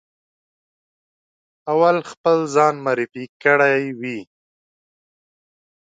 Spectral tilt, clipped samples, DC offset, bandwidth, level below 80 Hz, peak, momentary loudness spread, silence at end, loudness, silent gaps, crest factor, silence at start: -5.5 dB/octave; under 0.1%; under 0.1%; 9.2 kHz; -74 dBFS; -2 dBFS; 13 LU; 1.65 s; -18 LUFS; 2.17-2.24 s, 3.29-3.40 s; 20 dB; 1.65 s